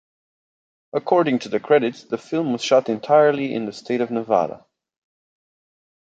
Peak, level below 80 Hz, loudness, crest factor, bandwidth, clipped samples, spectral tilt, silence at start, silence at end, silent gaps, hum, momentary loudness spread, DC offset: -2 dBFS; -70 dBFS; -20 LUFS; 20 dB; 8 kHz; under 0.1%; -5.5 dB/octave; 0.95 s; 1.5 s; none; none; 12 LU; under 0.1%